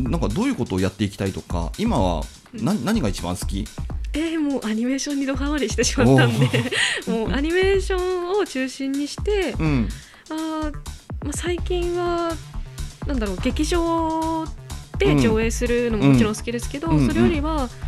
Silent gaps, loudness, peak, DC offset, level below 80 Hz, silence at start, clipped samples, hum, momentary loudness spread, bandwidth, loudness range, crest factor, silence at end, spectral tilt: none; -22 LUFS; -2 dBFS; under 0.1%; -32 dBFS; 0 s; under 0.1%; none; 11 LU; 14.5 kHz; 6 LU; 20 dB; 0 s; -5.5 dB/octave